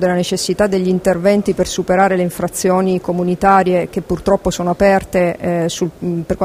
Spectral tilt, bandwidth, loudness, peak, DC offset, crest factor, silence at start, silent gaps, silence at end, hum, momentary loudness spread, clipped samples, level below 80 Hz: -5.5 dB/octave; 16 kHz; -15 LUFS; 0 dBFS; under 0.1%; 14 dB; 0 s; none; 0 s; none; 7 LU; under 0.1%; -38 dBFS